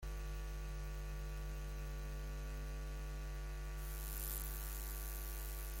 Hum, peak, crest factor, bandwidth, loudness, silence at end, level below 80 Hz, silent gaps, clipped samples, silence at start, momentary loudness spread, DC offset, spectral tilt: 50 Hz at -45 dBFS; -24 dBFS; 20 dB; 17 kHz; -47 LUFS; 0 s; -44 dBFS; none; under 0.1%; 0 s; 4 LU; under 0.1%; -4 dB/octave